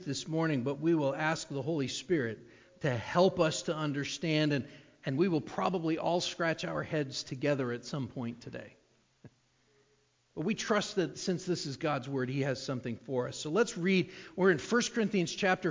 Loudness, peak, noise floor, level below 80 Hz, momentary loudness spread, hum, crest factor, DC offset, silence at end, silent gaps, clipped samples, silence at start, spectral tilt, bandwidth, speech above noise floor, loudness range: -32 LUFS; -12 dBFS; -71 dBFS; -68 dBFS; 9 LU; none; 20 dB; under 0.1%; 0 s; none; under 0.1%; 0 s; -5 dB/octave; 7.6 kHz; 39 dB; 6 LU